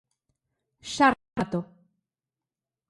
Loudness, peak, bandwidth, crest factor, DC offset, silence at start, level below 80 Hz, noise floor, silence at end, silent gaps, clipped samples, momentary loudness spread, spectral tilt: -26 LUFS; -6 dBFS; 11.5 kHz; 24 dB; under 0.1%; 0.85 s; -60 dBFS; under -90 dBFS; 1.25 s; none; under 0.1%; 21 LU; -4.5 dB/octave